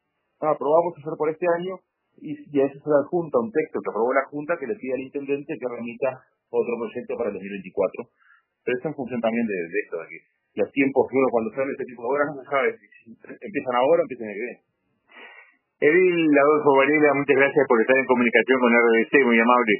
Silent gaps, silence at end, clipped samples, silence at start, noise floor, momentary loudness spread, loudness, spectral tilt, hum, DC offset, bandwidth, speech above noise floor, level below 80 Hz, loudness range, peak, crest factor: none; 0 s; under 0.1%; 0.4 s; -60 dBFS; 15 LU; -22 LUFS; -10 dB/octave; none; under 0.1%; 3.1 kHz; 38 dB; -72 dBFS; 11 LU; -2 dBFS; 20 dB